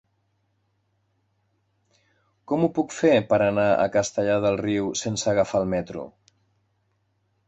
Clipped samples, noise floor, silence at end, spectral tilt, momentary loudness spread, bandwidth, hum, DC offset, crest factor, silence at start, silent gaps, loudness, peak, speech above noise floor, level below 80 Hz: under 0.1%; -71 dBFS; 1.4 s; -5 dB/octave; 9 LU; 8.2 kHz; none; under 0.1%; 18 dB; 2.5 s; none; -23 LUFS; -8 dBFS; 48 dB; -56 dBFS